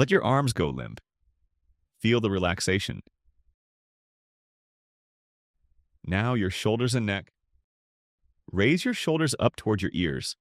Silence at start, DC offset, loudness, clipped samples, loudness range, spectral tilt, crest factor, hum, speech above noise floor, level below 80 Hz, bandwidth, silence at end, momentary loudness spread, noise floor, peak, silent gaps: 0 s; under 0.1%; -26 LUFS; under 0.1%; 7 LU; -5.5 dB/octave; 22 dB; none; 45 dB; -54 dBFS; 15.5 kHz; 0.05 s; 10 LU; -71 dBFS; -8 dBFS; 3.54-5.54 s, 7.64-8.18 s